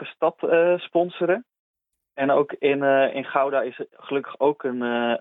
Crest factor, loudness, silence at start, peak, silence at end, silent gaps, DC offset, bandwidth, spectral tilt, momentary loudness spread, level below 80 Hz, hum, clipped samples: 18 dB; -23 LUFS; 0 s; -6 dBFS; 0 s; 1.59-1.74 s; under 0.1%; 4 kHz; -8.5 dB/octave; 9 LU; -78 dBFS; none; under 0.1%